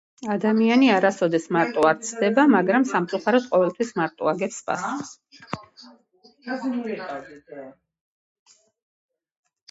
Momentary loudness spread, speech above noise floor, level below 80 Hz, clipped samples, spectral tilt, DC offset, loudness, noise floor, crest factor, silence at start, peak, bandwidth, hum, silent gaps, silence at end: 19 LU; 35 dB; -70 dBFS; under 0.1%; -5 dB/octave; under 0.1%; -22 LUFS; -57 dBFS; 18 dB; 0.2 s; -6 dBFS; 8.2 kHz; none; none; 2 s